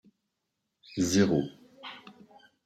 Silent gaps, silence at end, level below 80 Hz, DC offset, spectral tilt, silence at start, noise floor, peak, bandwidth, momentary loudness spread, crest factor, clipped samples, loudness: none; 0.55 s; -64 dBFS; under 0.1%; -5 dB/octave; 0.9 s; -83 dBFS; -12 dBFS; 13.5 kHz; 21 LU; 20 dB; under 0.1%; -28 LUFS